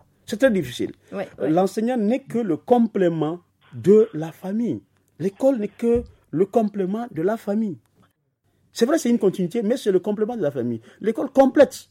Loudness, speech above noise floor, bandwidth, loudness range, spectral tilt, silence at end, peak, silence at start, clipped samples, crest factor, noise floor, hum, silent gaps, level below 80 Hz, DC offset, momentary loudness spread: -22 LUFS; 47 dB; 16 kHz; 3 LU; -6.5 dB/octave; 0.1 s; -4 dBFS; 0.3 s; under 0.1%; 18 dB; -68 dBFS; none; none; -54 dBFS; under 0.1%; 13 LU